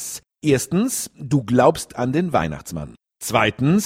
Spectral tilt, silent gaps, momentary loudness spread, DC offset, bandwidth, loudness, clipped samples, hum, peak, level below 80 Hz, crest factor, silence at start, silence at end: -5 dB/octave; none; 15 LU; under 0.1%; 16.5 kHz; -20 LUFS; under 0.1%; none; -2 dBFS; -48 dBFS; 20 dB; 0 s; 0 s